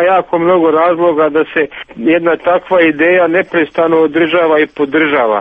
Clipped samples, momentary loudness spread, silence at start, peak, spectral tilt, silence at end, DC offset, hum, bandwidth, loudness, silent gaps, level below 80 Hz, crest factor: under 0.1%; 4 LU; 0 s; 0 dBFS; -8 dB/octave; 0 s; under 0.1%; none; 3.9 kHz; -11 LUFS; none; -52 dBFS; 10 dB